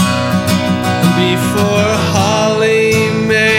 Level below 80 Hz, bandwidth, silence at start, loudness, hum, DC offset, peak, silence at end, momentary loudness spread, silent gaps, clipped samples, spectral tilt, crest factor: -42 dBFS; 17 kHz; 0 s; -12 LUFS; none; under 0.1%; 0 dBFS; 0 s; 3 LU; none; under 0.1%; -5 dB/octave; 12 dB